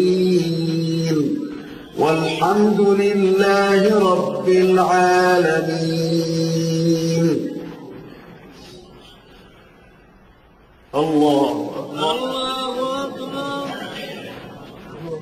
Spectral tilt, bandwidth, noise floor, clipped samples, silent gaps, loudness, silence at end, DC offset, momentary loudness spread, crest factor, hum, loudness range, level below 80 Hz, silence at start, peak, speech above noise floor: -6 dB/octave; 15 kHz; -50 dBFS; under 0.1%; none; -18 LUFS; 0 s; under 0.1%; 18 LU; 14 dB; none; 10 LU; -56 dBFS; 0 s; -4 dBFS; 34 dB